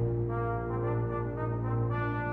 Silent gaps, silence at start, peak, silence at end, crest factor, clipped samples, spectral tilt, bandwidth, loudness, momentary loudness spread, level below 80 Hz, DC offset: none; 0 s; -18 dBFS; 0 s; 12 dB; under 0.1%; -11 dB/octave; 3.7 kHz; -32 LUFS; 2 LU; -44 dBFS; under 0.1%